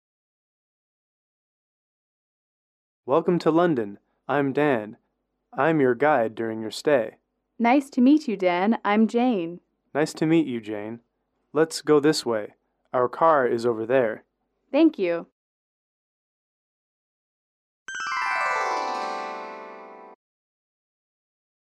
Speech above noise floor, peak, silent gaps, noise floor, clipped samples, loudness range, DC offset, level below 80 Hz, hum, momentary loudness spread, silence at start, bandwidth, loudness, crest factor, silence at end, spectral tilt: 50 dB; -8 dBFS; 15.32-17.86 s; -72 dBFS; under 0.1%; 7 LU; under 0.1%; -76 dBFS; none; 16 LU; 3.05 s; 13 kHz; -23 LUFS; 18 dB; 1.55 s; -5.5 dB/octave